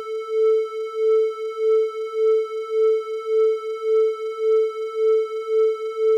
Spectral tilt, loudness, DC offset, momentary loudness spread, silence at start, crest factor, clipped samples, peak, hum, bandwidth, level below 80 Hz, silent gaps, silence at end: -1.5 dB/octave; -21 LUFS; under 0.1%; 5 LU; 0 s; 10 dB; under 0.1%; -12 dBFS; none; 7 kHz; under -90 dBFS; none; 0 s